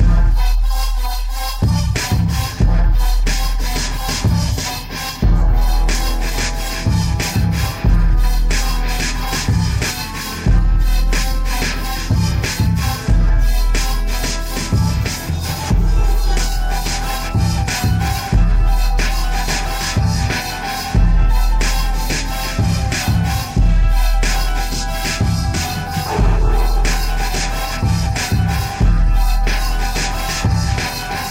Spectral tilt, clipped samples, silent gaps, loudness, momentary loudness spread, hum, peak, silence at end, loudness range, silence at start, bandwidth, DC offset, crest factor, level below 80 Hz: -4.5 dB/octave; under 0.1%; none; -18 LUFS; 4 LU; none; -2 dBFS; 0 s; 1 LU; 0 s; 16.5 kHz; under 0.1%; 12 dB; -16 dBFS